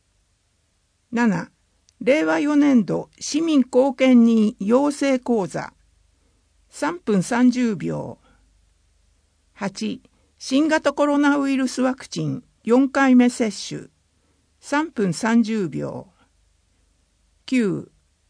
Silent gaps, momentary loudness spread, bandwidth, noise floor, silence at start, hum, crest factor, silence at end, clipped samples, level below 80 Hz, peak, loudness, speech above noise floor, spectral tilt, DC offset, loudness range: none; 15 LU; 10.5 kHz; -66 dBFS; 1.1 s; none; 16 dB; 0.45 s; under 0.1%; -62 dBFS; -4 dBFS; -20 LUFS; 47 dB; -5.5 dB/octave; under 0.1%; 7 LU